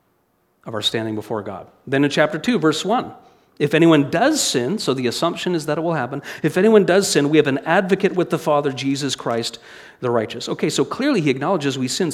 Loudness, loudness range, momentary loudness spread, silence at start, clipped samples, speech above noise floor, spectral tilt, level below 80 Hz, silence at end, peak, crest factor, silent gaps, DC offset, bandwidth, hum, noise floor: -19 LUFS; 4 LU; 11 LU; 0.65 s; under 0.1%; 45 dB; -4.5 dB/octave; -62 dBFS; 0 s; 0 dBFS; 20 dB; none; under 0.1%; 16 kHz; none; -64 dBFS